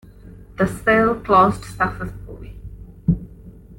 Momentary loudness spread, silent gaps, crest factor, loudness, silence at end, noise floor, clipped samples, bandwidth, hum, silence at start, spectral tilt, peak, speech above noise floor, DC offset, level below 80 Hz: 24 LU; none; 18 dB; -19 LUFS; 0.05 s; -41 dBFS; under 0.1%; 17 kHz; none; 0.25 s; -7 dB/octave; -2 dBFS; 24 dB; under 0.1%; -38 dBFS